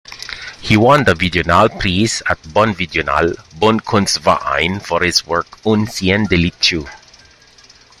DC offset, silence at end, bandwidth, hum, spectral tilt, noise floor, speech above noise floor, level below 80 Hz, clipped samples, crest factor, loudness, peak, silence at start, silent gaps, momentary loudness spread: under 0.1%; 1.05 s; 16 kHz; none; -4.5 dB/octave; -45 dBFS; 31 dB; -38 dBFS; under 0.1%; 16 dB; -14 LUFS; 0 dBFS; 0.1 s; none; 8 LU